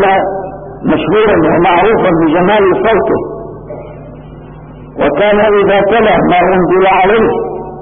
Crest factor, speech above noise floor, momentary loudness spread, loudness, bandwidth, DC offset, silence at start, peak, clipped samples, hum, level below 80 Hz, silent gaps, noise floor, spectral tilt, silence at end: 10 dB; 21 dB; 18 LU; -9 LUFS; 3.7 kHz; 0.5%; 0 s; 0 dBFS; under 0.1%; none; -34 dBFS; none; -30 dBFS; -12 dB/octave; 0 s